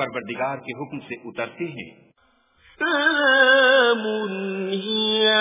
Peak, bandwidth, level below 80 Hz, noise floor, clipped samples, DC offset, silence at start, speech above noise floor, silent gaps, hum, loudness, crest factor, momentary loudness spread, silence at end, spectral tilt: -4 dBFS; 3.9 kHz; -66 dBFS; -62 dBFS; under 0.1%; under 0.1%; 0 s; 41 dB; none; none; -19 LUFS; 18 dB; 18 LU; 0 s; -7.5 dB/octave